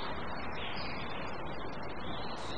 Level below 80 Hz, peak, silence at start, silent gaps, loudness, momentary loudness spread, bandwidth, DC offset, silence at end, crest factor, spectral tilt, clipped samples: -52 dBFS; -26 dBFS; 0 s; none; -40 LUFS; 3 LU; 9.6 kHz; 1%; 0 s; 12 dB; -5.5 dB/octave; under 0.1%